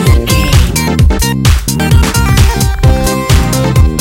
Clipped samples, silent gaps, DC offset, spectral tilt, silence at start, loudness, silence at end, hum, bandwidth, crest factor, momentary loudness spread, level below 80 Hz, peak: 2%; none; under 0.1%; -5 dB/octave; 0 s; -10 LUFS; 0 s; none; 17.5 kHz; 8 dB; 2 LU; -12 dBFS; 0 dBFS